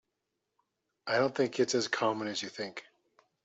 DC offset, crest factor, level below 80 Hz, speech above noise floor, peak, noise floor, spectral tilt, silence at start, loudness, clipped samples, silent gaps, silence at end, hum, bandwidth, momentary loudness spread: under 0.1%; 20 dB; -78 dBFS; 53 dB; -14 dBFS; -84 dBFS; -3.5 dB/octave; 1.05 s; -32 LUFS; under 0.1%; none; 0.65 s; none; 8.2 kHz; 12 LU